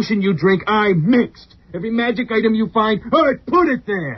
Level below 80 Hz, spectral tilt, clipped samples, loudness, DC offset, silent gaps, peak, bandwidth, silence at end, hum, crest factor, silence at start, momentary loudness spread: -48 dBFS; -5 dB/octave; under 0.1%; -17 LUFS; under 0.1%; none; -2 dBFS; 6.2 kHz; 0 s; none; 14 dB; 0 s; 6 LU